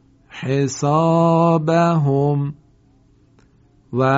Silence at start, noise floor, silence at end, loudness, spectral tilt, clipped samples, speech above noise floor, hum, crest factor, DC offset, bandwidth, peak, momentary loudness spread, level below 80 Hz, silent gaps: 0.35 s; -54 dBFS; 0 s; -17 LUFS; -7.5 dB/octave; under 0.1%; 38 dB; none; 16 dB; under 0.1%; 7.8 kHz; -4 dBFS; 13 LU; -56 dBFS; none